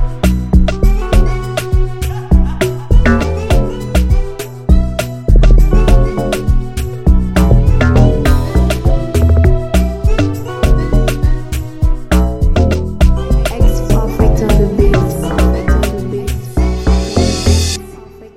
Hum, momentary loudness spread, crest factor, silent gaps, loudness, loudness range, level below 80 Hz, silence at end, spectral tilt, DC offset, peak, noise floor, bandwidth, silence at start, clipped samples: none; 7 LU; 10 dB; none; -14 LUFS; 3 LU; -12 dBFS; 0.1 s; -6.5 dB/octave; 0.7%; 0 dBFS; -33 dBFS; 15.5 kHz; 0 s; under 0.1%